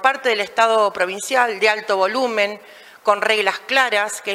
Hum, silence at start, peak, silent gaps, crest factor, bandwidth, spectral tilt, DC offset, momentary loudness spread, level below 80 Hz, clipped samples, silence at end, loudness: none; 0 s; -2 dBFS; none; 18 dB; 16 kHz; -1.5 dB/octave; under 0.1%; 5 LU; -72 dBFS; under 0.1%; 0 s; -18 LUFS